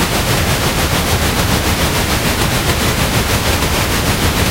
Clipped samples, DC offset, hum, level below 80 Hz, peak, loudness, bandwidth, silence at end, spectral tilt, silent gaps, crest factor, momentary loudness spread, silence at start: under 0.1%; under 0.1%; none; -22 dBFS; 0 dBFS; -14 LUFS; 16 kHz; 0 s; -3.5 dB/octave; none; 14 dB; 0 LU; 0 s